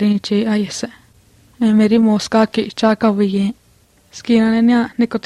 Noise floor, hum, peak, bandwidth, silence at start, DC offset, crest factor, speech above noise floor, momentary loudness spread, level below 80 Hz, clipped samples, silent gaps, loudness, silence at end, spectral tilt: -53 dBFS; none; -2 dBFS; 11 kHz; 0 s; under 0.1%; 14 dB; 38 dB; 10 LU; -54 dBFS; under 0.1%; none; -15 LUFS; 0.05 s; -6 dB/octave